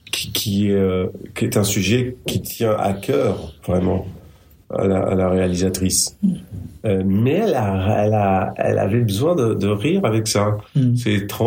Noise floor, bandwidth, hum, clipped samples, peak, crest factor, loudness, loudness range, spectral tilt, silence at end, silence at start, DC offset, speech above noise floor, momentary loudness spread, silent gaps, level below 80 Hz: -47 dBFS; 16.5 kHz; none; under 0.1%; -4 dBFS; 16 dB; -19 LUFS; 2 LU; -5.5 dB/octave; 0 s; 0.15 s; under 0.1%; 28 dB; 6 LU; none; -48 dBFS